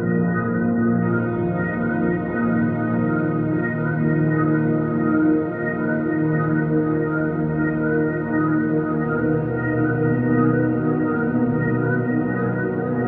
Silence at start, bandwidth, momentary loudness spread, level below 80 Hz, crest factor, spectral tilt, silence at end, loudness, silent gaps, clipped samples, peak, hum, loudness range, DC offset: 0 s; 3.6 kHz; 3 LU; -48 dBFS; 14 dB; -13 dB/octave; 0 s; -21 LUFS; none; under 0.1%; -6 dBFS; none; 1 LU; under 0.1%